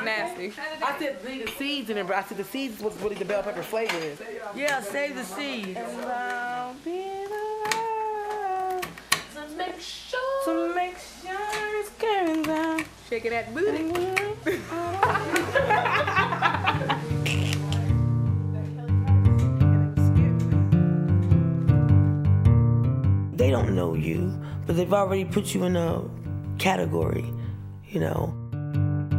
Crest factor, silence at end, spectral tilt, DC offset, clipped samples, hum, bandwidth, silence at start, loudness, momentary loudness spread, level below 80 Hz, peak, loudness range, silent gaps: 20 dB; 0 s; -6.5 dB/octave; under 0.1%; under 0.1%; none; 16 kHz; 0 s; -25 LUFS; 12 LU; -42 dBFS; -4 dBFS; 8 LU; none